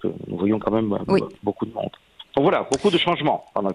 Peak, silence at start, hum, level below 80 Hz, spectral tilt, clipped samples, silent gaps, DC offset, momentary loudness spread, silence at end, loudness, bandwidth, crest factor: -4 dBFS; 0 s; none; -54 dBFS; -5.5 dB/octave; under 0.1%; none; under 0.1%; 9 LU; 0 s; -22 LUFS; 11.5 kHz; 18 dB